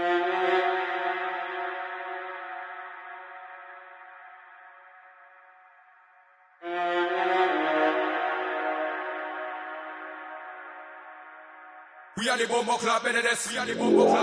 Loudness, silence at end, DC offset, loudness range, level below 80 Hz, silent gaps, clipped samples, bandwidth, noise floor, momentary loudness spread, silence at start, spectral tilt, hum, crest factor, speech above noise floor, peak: -27 LUFS; 0 s; under 0.1%; 17 LU; -78 dBFS; none; under 0.1%; 11 kHz; -59 dBFS; 22 LU; 0 s; -3 dB/octave; none; 20 dB; 35 dB; -10 dBFS